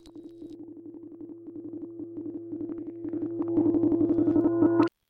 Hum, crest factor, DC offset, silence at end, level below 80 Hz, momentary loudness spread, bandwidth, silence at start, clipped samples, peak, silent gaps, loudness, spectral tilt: none; 20 dB; under 0.1%; 0.2 s; -60 dBFS; 21 LU; 4.9 kHz; 0.05 s; under 0.1%; -10 dBFS; none; -27 LUFS; -10 dB/octave